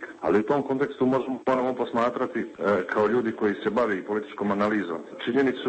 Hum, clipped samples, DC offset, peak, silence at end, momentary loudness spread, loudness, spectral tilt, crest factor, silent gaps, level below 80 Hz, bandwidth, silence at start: none; under 0.1%; under 0.1%; -10 dBFS; 0 s; 5 LU; -26 LUFS; -7 dB/octave; 14 dB; none; -64 dBFS; 8.4 kHz; 0 s